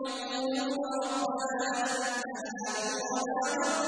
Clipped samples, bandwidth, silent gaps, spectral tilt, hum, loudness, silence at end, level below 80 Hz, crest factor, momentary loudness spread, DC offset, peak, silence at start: under 0.1%; 10.5 kHz; none; -1.5 dB/octave; none; -32 LUFS; 0 s; -76 dBFS; 14 dB; 4 LU; under 0.1%; -18 dBFS; 0 s